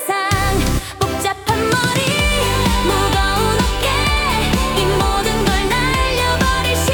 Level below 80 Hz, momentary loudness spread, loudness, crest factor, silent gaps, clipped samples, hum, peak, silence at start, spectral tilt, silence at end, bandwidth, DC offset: -24 dBFS; 3 LU; -16 LUFS; 14 dB; none; under 0.1%; none; -2 dBFS; 0 s; -4 dB/octave; 0 s; 19 kHz; under 0.1%